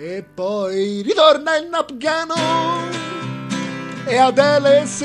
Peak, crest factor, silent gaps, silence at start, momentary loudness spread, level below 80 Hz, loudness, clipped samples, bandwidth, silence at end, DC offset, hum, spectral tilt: 0 dBFS; 18 dB; none; 0 s; 13 LU; -60 dBFS; -18 LUFS; under 0.1%; 11.5 kHz; 0 s; under 0.1%; none; -4 dB/octave